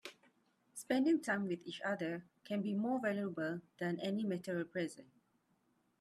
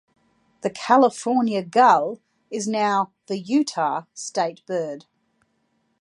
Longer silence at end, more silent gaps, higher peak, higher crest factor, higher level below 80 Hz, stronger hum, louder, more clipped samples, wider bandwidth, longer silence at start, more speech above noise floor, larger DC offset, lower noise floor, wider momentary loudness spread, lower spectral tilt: about the same, 0.95 s vs 1 s; neither; second, -22 dBFS vs -4 dBFS; about the same, 18 dB vs 20 dB; second, -84 dBFS vs -76 dBFS; neither; second, -39 LUFS vs -22 LUFS; neither; first, 14 kHz vs 11.5 kHz; second, 0.05 s vs 0.65 s; second, 40 dB vs 48 dB; neither; first, -78 dBFS vs -69 dBFS; about the same, 12 LU vs 14 LU; first, -6 dB/octave vs -4.5 dB/octave